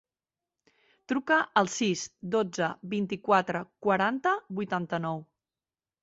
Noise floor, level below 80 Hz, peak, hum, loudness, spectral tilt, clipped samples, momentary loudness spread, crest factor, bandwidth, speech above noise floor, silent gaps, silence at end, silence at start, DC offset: under -90 dBFS; -72 dBFS; -10 dBFS; none; -29 LUFS; -4.5 dB/octave; under 0.1%; 7 LU; 20 dB; 8.2 kHz; over 62 dB; none; 0.8 s; 1.1 s; under 0.1%